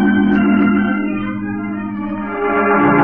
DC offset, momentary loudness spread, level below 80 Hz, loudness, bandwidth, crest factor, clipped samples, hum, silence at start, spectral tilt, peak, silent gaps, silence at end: under 0.1%; 10 LU; -40 dBFS; -16 LUFS; 3.5 kHz; 14 dB; under 0.1%; none; 0 s; -10.5 dB/octave; 0 dBFS; none; 0 s